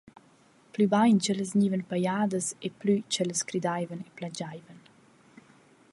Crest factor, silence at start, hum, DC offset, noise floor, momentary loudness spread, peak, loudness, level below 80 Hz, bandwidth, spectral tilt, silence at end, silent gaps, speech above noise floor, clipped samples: 18 dB; 0.75 s; none; under 0.1%; -60 dBFS; 15 LU; -12 dBFS; -28 LUFS; -74 dBFS; 11.5 kHz; -5 dB/octave; 1.15 s; none; 33 dB; under 0.1%